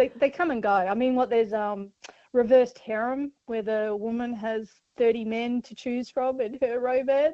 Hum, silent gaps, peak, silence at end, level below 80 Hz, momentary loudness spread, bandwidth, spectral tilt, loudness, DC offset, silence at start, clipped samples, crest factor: none; none; -10 dBFS; 0 s; -64 dBFS; 10 LU; 7.6 kHz; -6 dB/octave; -26 LUFS; under 0.1%; 0 s; under 0.1%; 16 dB